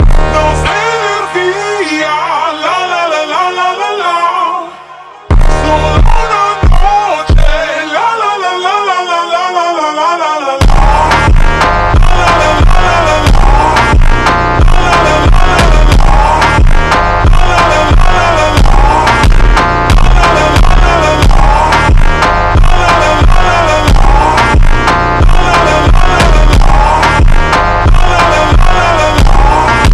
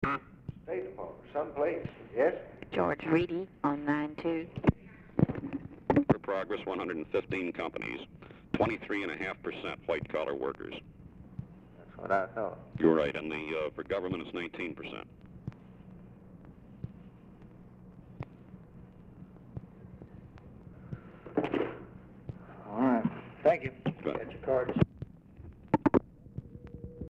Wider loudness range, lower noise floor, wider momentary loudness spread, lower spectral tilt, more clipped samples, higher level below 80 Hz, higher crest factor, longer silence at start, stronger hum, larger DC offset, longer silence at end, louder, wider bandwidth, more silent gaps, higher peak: second, 3 LU vs 18 LU; second, -30 dBFS vs -53 dBFS; second, 4 LU vs 24 LU; second, -5 dB/octave vs -8.5 dB/octave; neither; first, -8 dBFS vs -56 dBFS; second, 6 dB vs 24 dB; about the same, 0 s vs 0 s; neither; neither; about the same, 0 s vs 0 s; first, -9 LUFS vs -33 LUFS; first, 11.5 kHz vs 8.2 kHz; neither; first, 0 dBFS vs -12 dBFS